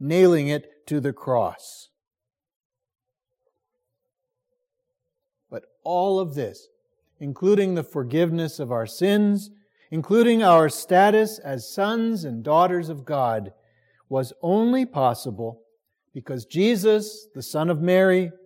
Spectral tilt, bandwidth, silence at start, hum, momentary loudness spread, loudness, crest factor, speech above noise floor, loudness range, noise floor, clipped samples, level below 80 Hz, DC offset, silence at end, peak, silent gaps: -6 dB/octave; 16.5 kHz; 0 s; none; 17 LU; -22 LUFS; 18 dB; 60 dB; 10 LU; -81 dBFS; under 0.1%; -74 dBFS; under 0.1%; 0.15 s; -6 dBFS; 2.56-2.70 s